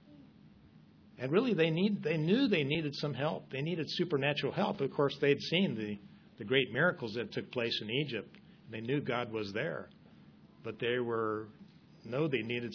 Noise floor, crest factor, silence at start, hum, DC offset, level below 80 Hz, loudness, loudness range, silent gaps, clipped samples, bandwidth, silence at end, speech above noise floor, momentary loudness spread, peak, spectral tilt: -59 dBFS; 22 dB; 0.1 s; none; under 0.1%; -72 dBFS; -33 LUFS; 5 LU; none; under 0.1%; 5.4 kHz; 0 s; 26 dB; 13 LU; -12 dBFS; -7 dB/octave